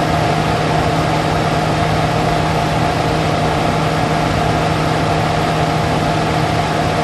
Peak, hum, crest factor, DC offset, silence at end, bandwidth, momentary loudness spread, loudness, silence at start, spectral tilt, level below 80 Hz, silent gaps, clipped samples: 0 dBFS; none; 14 dB; under 0.1%; 0 s; 13 kHz; 1 LU; -16 LUFS; 0 s; -5.5 dB/octave; -30 dBFS; none; under 0.1%